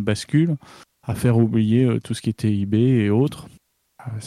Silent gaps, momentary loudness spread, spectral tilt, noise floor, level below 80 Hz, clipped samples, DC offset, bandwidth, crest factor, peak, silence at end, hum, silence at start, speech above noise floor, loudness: none; 15 LU; -7.5 dB/octave; -39 dBFS; -52 dBFS; under 0.1%; under 0.1%; 14 kHz; 14 dB; -6 dBFS; 0 s; none; 0 s; 20 dB; -20 LUFS